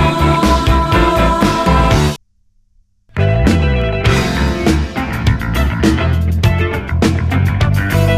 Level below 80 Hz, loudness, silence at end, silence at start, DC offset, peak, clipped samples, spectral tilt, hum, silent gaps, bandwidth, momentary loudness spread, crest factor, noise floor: -20 dBFS; -14 LUFS; 0 s; 0 s; under 0.1%; 0 dBFS; under 0.1%; -6 dB/octave; none; none; 15.5 kHz; 5 LU; 12 dB; -54 dBFS